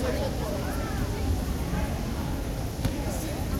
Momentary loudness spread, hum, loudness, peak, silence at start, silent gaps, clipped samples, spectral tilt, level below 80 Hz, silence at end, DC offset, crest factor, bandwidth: 2 LU; none; -30 LUFS; -14 dBFS; 0 s; none; under 0.1%; -6 dB/octave; -34 dBFS; 0 s; under 0.1%; 14 dB; 16.5 kHz